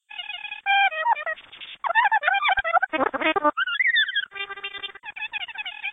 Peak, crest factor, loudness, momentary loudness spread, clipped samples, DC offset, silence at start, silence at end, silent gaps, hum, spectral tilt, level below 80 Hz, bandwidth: -6 dBFS; 18 dB; -23 LUFS; 13 LU; under 0.1%; under 0.1%; 0.1 s; 0 s; none; none; -4.5 dB/octave; -60 dBFS; 4 kHz